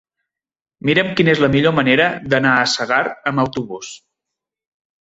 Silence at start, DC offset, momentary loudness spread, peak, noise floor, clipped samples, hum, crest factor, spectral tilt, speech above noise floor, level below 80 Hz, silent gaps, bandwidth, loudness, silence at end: 0.85 s; under 0.1%; 12 LU; -2 dBFS; -83 dBFS; under 0.1%; none; 18 dB; -5 dB/octave; 67 dB; -50 dBFS; none; 8 kHz; -16 LUFS; 1.05 s